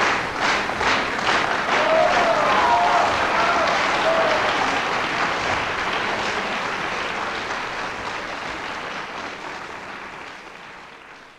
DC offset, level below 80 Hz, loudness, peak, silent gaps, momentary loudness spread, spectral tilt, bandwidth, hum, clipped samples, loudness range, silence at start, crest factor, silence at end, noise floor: under 0.1%; -50 dBFS; -21 LUFS; -6 dBFS; none; 16 LU; -3 dB/octave; 14.5 kHz; none; under 0.1%; 11 LU; 0 s; 16 dB; 0.05 s; -43 dBFS